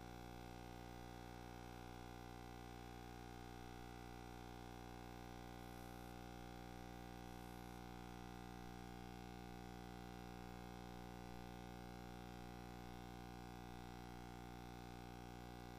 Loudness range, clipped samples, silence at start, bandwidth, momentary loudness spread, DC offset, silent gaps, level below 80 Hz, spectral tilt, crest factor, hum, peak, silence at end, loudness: 1 LU; under 0.1%; 0 s; 15.5 kHz; 1 LU; under 0.1%; none; -62 dBFS; -5.5 dB/octave; 12 dB; 60 Hz at -60 dBFS; -42 dBFS; 0 s; -56 LUFS